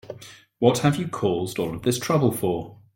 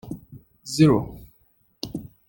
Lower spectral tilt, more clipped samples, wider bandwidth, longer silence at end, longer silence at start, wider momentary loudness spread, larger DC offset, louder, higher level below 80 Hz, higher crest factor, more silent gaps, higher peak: about the same, -6 dB/octave vs -6.5 dB/octave; neither; about the same, 17 kHz vs 17 kHz; about the same, 0.2 s vs 0.25 s; about the same, 0.05 s vs 0.05 s; second, 10 LU vs 21 LU; neither; about the same, -23 LUFS vs -22 LUFS; second, -56 dBFS vs -50 dBFS; about the same, 20 dB vs 20 dB; neither; about the same, -4 dBFS vs -4 dBFS